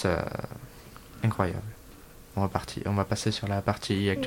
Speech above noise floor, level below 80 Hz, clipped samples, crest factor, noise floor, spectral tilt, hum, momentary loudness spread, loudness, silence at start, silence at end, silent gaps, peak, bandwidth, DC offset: 21 dB; -50 dBFS; under 0.1%; 22 dB; -49 dBFS; -6 dB/octave; none; 20 LU; -30 LUFS; 0 s; 0 s; none; -8 dBFS; 17 kHz; under 0.1%